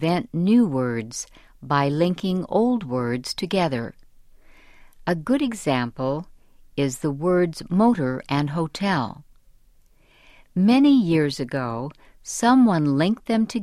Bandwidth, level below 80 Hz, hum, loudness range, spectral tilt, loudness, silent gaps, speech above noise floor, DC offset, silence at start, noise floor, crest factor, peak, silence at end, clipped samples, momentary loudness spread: 13.5 kHz; -52 dBFS; none; 6 LU; -6 dB/octave; -22 LUFS; none; 34 dB; under 0.1%; 0 s; -55 dBFS; 16 dB; -6 dBFS; 0 s; under 0.1%; 14 LU